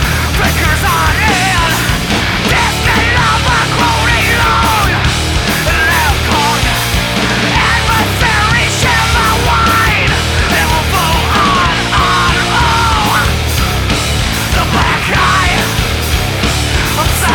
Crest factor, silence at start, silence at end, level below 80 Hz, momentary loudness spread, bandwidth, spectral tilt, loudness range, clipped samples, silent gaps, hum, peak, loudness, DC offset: 12 dB; 0 s; 0 s; -20 dBFS; 3 LU; 19.5 kHz; -3.5 dB/octave; 1 LU; under 0.1%; none; none; 0 dBFS; -10 LUFS; under 0.1%